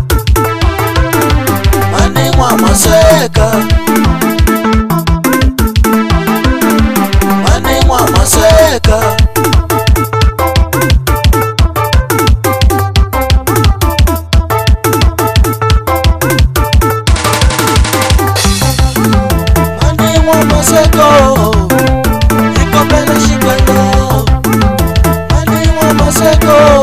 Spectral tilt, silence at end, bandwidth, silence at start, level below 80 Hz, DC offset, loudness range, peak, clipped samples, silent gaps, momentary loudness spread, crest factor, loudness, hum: -5 dB/octave; 0 s; 16 kHz; 0 s; -14 dBFS; under 0.1%; 2 LU; 0 dBFS; 0.7%; none; 5 LU; 8 dB; -9 LUFS; none